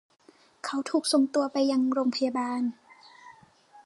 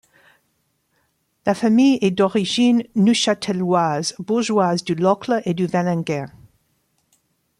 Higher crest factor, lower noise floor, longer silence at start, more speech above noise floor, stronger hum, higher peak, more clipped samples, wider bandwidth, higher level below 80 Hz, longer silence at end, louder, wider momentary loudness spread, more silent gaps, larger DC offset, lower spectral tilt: about the same, 18 dB vs 16 dB; second, -56 dBFS vs -68 dBFS; second, 0.65 s vs 1.45 s; second, 30 dB vs 50 dB; neither; second, -12 dBFS vs -4 dBFS; neither; about the same, 11.5 kHz vs 11.5 kHz; second, -82 dBFS vs -62 dBFS; second, 0.05 s vs 1.3 s; second, -27 LUFS vs -19 LUFS; about the same, 9 LU vs 8 LU; neither; neither; second, -3 dB/octave vs -5.5 dB/octave